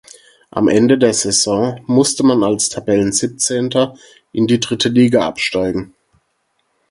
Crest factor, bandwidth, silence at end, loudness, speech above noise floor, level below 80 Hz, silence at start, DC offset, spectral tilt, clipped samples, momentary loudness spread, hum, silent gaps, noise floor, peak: 16 dB; 11.5 kHz; 1.05 s; -15 LUFS; 51 dB; -50 dBFS; 0.55 s; under 0.1%; -4 dB/octave; under 0.1%; 7 LU; none; none; -66 dBFS; 0 dBFS